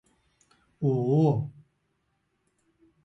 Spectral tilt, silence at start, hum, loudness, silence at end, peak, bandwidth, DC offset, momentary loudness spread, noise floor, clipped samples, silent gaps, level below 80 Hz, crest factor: -11 dB/octave; 0.8 s; none; -26 LUFS; 1.55 s; -14 dBFS; 7.2 kHz; under 0.1%; 9 LU; -75 dBFS; under 0.1%; none; -66 dBFS; 16 dB